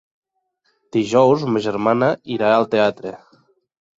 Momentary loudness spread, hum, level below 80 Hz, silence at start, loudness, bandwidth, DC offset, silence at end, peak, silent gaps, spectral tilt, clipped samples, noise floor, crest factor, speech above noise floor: 9 LU; none; -62 dBFS; 0.95 s; -18 LUFS; 7.8 kHz; under 0.1%; 0.85 s; -2 dBFS; none; -6.5 dB/octave; under 0.1%; -68 dBFS; 18 dB; 51 dB